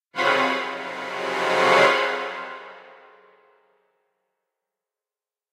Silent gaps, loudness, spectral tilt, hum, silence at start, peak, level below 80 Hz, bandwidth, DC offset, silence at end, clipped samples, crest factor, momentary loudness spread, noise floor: none; -21 LUFS; -3 dB/octave; none; 0.15 s; -2 dBFS; -86 dBFS; 15.5 kHz; under 0.1%; 2.6 s; under 0.1%; 22 dB; 19 LU; under -90 dBFS